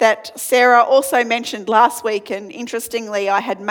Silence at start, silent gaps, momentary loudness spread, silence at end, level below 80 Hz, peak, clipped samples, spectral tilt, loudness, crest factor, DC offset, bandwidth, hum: 0 s; none; 13 LU; 0 s; -68 dBFS; 0 dBFS; under 0.1%; -2 dB/octave; -16 LUFS; 16 dB; under 0.1%; 19 kHz; none